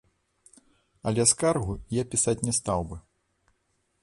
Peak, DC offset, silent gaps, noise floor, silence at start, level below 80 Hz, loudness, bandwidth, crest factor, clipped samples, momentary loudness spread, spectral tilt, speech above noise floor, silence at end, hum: -6 dBFS; under 0.1%; none; -73 dBFS; 1.05 s; -48 dBFS; -26 LUFS; 11.5 kHz; 22 dB; under 0.1%; 13 LU; -4 dB/octave; 47 dB; 1.05 s; none